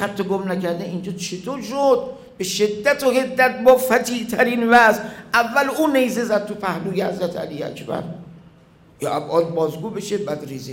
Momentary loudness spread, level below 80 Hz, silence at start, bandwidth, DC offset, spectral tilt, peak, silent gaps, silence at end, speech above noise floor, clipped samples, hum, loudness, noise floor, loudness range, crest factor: 14 LU; -58 dBFS; 0 s; 16.5 kHz; under 0.1%; -4.5 dB/octave; -2 dBFS; none; 0 s; 30 dB; under 0.1%; none; -20 LUFS; -50 dBFS; 9 LU; 18 dB